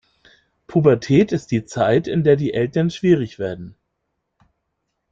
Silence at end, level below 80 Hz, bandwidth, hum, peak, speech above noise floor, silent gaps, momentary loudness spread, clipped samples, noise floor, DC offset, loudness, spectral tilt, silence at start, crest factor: 1.4 s; -52 dBFS; 7.6 kHz; none; -2 dBFS; 57 dB; none; 10 LU; under 0.1%; -75 dBFS; under 0.1%; -18 LUFS; -7.5 dB/octave; 0.7 s; 18 dB